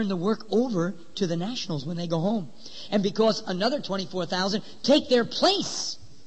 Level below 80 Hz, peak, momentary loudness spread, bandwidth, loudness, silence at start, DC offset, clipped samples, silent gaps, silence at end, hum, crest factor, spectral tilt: -64 dBFS; -8 dBFS; 9 LU; 8.8 kHz; -26 LUFS; 0 s; 1%; under 0.1%; none; 0.2 s; none; 18 dB; -5 dB/octave